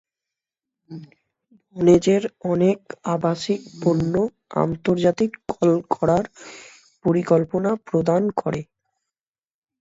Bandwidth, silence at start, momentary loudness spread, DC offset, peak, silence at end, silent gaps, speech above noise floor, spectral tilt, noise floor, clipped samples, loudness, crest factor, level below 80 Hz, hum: 8 kHz; 0.9 s; 19 LU; under 0.1%; -4 dBFS; 1.15 s; none; over 70 dB; -7 dB/octave; under -90 dBFS; under 0.1%; -21 LUFS; 20 dB; -54 dBFS; none